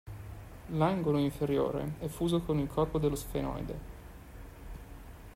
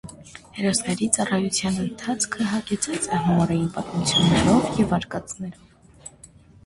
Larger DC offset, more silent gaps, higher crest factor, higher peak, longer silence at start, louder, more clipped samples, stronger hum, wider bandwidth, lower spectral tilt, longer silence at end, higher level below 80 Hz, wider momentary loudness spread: neither; neither; about the same, 18 dB vs 22 dB; second, -16 dBFS vs 0 dBFS; about the same, 0.05 s vs 0.05 s; second, -32 LUFS vs -22 LUFS; neither; neither; first, 16 kHz vs 11.5 kHz; first, -7 dB/octave vs -4.5 dB/octave; second, 0 s vs 0.4 s; about the same, -48 dBFS vs -46 dBFS; about the same, 20 LU vs 21 LU